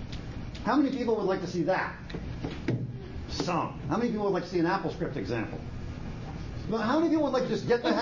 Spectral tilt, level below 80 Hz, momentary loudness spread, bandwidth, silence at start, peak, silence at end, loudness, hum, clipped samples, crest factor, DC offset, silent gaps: -6.5 dB/octave; -46 dBFS; 13 LU; 7.4 kHz; 0 s; -14 dBFS; 0 s; -30 LUFS; none; under 0.1%; 16 dB; under 0.1%; none